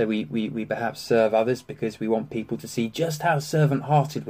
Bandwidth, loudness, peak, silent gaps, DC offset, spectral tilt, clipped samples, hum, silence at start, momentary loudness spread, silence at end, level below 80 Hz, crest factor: 16 kHz; -25 LUFS; -8 dBFS; none; under 0.1%; -6.5 dB/octave; under 0.1%; none; 0 s; 9 LU; 0 s; -62 dBFS; 16 dB